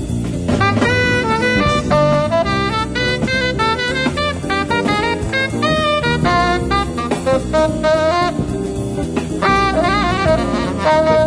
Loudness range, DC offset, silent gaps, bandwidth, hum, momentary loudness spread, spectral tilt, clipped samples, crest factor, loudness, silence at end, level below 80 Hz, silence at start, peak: 2 LU; under 0.1%; none; 11 kHz; none; 5 LU; -5.5 dB/octave; under 0.1%; 12 dB; -16 LUFS; 0 s; -30 dBFS; 0 s; -2 dBFS